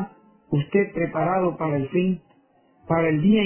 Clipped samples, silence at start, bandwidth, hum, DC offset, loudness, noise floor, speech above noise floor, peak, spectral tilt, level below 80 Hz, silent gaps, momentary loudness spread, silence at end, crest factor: under 0.1%; 0 s; 3.2 kHz; none; under 0.1%; -23 LUFS; -60 dBFS; 38 dB; -8 dBFS; -11.5 dB/octave; -56 dBFS; none; 7 LU; 0 s; 14 dB